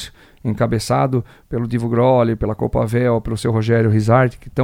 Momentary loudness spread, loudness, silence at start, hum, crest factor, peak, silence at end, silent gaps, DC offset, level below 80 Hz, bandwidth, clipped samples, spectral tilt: 10 LU; -18 LUFS; 0 s; none; 16 dB; 0 dBFS; 0 s; none; under 0.1%; -36 dBFS; 15.5 kHz; under 0.1%; -7.5 dB/octave